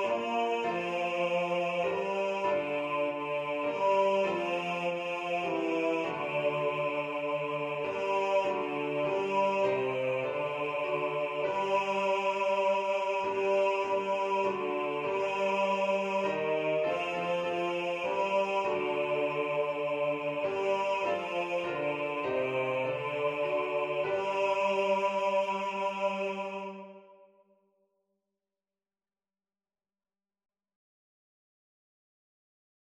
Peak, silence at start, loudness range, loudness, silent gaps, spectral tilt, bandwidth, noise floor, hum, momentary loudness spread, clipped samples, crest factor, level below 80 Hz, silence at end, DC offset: -16 dBFS; 0 s; 2 LU; -31 LUFS; none; -5 dB/octave; 9.6 kHz; under -90 dBFS; none; 4 LU; under 0.1%; 14 dB; -76 dBFS; 5.7 s; under 0.1%